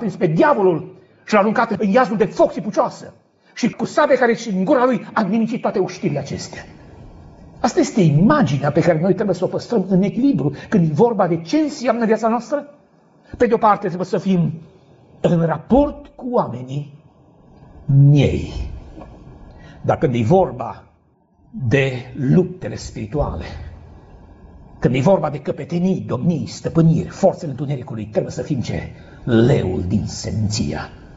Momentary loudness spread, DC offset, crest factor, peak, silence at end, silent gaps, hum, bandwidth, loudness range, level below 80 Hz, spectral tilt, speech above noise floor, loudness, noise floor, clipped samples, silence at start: 14 LU; under 0.1%; 16 dB; -2 dBFS; 0 s; none; none; 8 kHz; 5 LU; -40 dBFS; -7 dB/octave; 39 dB; -18 LUFS; -57 dBFS; under 0.1%; 0 s